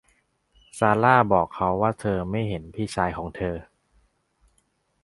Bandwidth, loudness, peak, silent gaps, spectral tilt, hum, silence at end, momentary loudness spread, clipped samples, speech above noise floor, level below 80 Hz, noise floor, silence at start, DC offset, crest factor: 11.5 kHz; -23 LUFS; -2 dBFS; none; -6.5 dB/octave; none; 1.4 s; 13 LU; under 0.1%; 46 dB; -48 dBFS; -69 dBFS; 0.75 s; under 0.1%; 24 dB